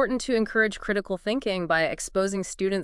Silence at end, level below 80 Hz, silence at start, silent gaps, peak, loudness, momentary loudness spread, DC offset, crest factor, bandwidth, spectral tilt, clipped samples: 0 s; -50 dBFS; 0 s; none; -10 dBFS; -26 LUFS; 4 LU; under 0.1%; 16 dB; 12 kHz; -4 dB/octave; under 0.1%